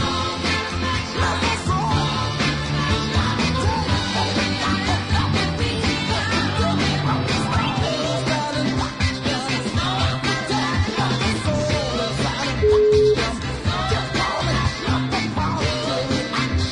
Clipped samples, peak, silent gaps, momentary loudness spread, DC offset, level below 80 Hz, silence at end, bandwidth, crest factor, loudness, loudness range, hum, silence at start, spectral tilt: under 0.1%; -6 dBFS; none; 3 LU; under 0.1%; -36 dBFS; 0 s; 11 kHz; 14 dB; -21 LUFS; 2 LU; none; 0 s; -5 dB/octave